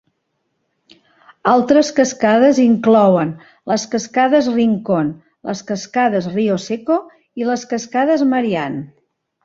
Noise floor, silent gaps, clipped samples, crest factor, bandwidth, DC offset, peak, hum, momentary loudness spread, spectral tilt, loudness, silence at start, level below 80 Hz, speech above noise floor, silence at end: -70 dBFS; none; under 0.1%; 16 dB; 7.8 kHz; under 0.1%; -2 dBFS; none; 12 LU; -5.5 dB/octave; -16 LUFS; 1.45 s; -60 dBFS; 55 dB; 0.6 s